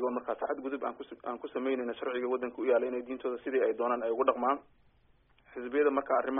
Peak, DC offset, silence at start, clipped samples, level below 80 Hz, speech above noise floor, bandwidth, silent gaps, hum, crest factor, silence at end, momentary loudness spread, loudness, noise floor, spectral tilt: -12 dBFS; under 0.1%; 0 s; under 0.1%; -72 dBFS; 34 dB; 3.8 kHz; none; none; 20 dB; 0 s; 10 LU; -32 LUFS; -66 dBFS; 1.5 dB/octave